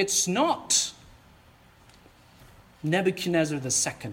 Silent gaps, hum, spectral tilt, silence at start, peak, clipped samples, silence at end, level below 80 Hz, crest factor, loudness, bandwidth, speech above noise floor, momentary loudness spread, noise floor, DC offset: none; none; -3 dB/octave; 0 s; -8 dBFS; under 0.1%; 0 s; -60 dBFS; 20 dB; -25 LUFS; 17 kHz; 30 dB; 5 LU; -56 dBFS; under 0.1%